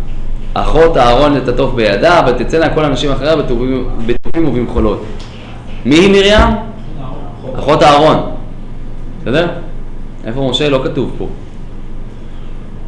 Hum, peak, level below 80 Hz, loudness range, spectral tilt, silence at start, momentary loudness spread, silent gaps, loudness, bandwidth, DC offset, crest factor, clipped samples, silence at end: none; 0 dBFS; -20 dBFS; 7 LU; -6 dB/octave; 0 s; 23 LU; none; -11 LUFS; 10.5 kHz; under 0.1%; 12 dB; under 0.1%; 0 s